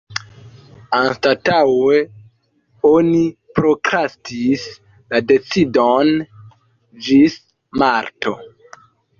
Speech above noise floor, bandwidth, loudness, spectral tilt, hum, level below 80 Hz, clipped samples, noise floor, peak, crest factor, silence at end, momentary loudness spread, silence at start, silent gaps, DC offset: 44 dB; 7.4 kHz; -16 LUFS; -6 dB/octave; none; -52 dBFS; under 0.1%; -59 dBFS; -2 dBFS; 16 dB; 0.7 s; 15 LU; 0.1 s; none; under 0.1%